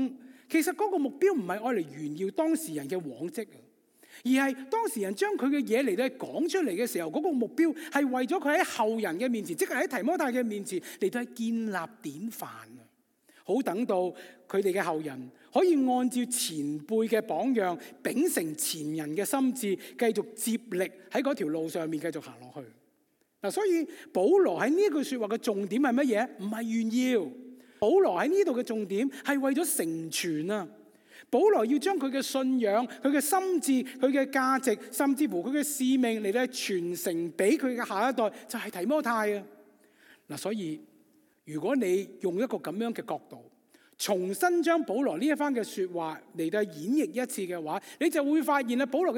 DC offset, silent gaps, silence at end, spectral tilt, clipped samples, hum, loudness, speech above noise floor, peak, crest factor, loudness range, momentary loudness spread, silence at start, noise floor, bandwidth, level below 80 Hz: under 0.1%; none; 0 s; -4 dB/octave; under 0.1%; none; -29 LUFS; 43 dB; -12 dBFS; 18 dB; 6 LU; 10 LU; 0 s; -72 dBFS; 17.5 kHz; -86 dBFS